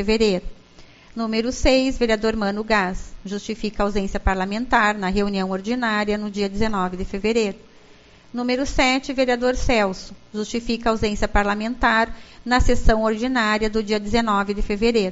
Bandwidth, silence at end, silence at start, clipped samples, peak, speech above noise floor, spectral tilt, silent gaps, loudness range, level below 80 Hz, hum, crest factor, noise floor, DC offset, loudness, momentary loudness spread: 8 kHz; 0 s; 0 s; under 0.1%; 0 dBFS; 28 dB; -3.5 dB/octave; none; 3 LU; -30 dBFS; none; 20 dB; -48 dBFS; under 0.1%; -21 LUFS; 9 LU